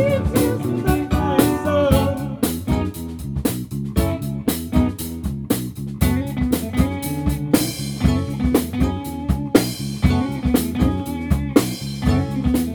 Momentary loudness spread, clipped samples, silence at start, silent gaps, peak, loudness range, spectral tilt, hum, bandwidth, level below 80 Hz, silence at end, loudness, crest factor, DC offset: 6 LU; under 0.1%; 0 s; none; 0 dBFS; 3 LU; -6 dB/octave; none; over 20 kHz; -28 dBFS; 0 s; -21 LUFS; 18 dB; under 0.1%